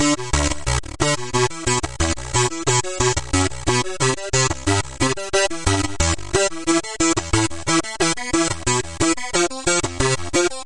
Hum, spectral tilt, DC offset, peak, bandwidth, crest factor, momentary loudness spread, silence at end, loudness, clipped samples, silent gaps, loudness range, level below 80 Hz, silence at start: none; -3.5 dB/octave; under 0.1%; -2 dBFS; 11.5 kHz; 18 dB; 3 LU; 0 s; -20 LUFS; under 0.1%; none; 0 LU; -34 dBFS; 0 s